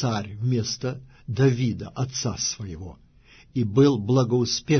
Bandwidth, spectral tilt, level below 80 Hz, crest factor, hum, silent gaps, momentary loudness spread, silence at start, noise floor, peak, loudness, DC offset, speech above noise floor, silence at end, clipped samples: 6.6 kHz; -5.5 dB/octave; -52 dBFS; 16 dB; none; none; 14 LU; 0 s; -53 dBFS; -8 dBFS; -24 LUFS; under 0.1%; 30 dB; 0 s; under 0.1%